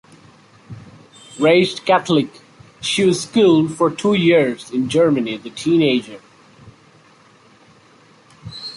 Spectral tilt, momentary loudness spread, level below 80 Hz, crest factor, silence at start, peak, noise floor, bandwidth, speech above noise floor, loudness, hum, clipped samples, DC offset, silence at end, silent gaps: -5 dB/octave; 17 LU; -58 dBFS; 16 dB; 0.7 s; -2 dBFS; -50 dBFS; 11.5 kHz; 34 dB; -17 LUFS; none; under 0.1%; under 0.1%; 0.05 s; none